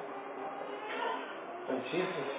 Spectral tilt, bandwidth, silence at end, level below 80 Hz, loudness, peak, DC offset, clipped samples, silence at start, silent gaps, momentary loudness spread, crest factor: -3 dB/octave; 4 kHz; 0 s; under -90 dBFS; -38 LUFS; -22 dBFS; under 0.1%; under 0.1%; 0 s; none; 8 LU; 16 dB